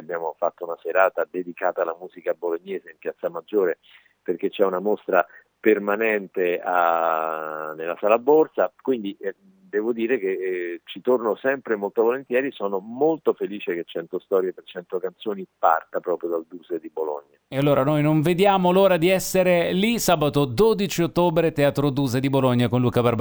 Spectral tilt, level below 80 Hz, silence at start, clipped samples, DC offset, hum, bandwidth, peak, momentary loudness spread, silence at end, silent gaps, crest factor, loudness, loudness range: -6 dB/octave; -56 dBFS; 0 s; under 0.1%; under 0.1%; none; over 20 kHz; -2 dBFS; 12 LU; 0 s; none; 20 dB; -23 LUFS; 7 LU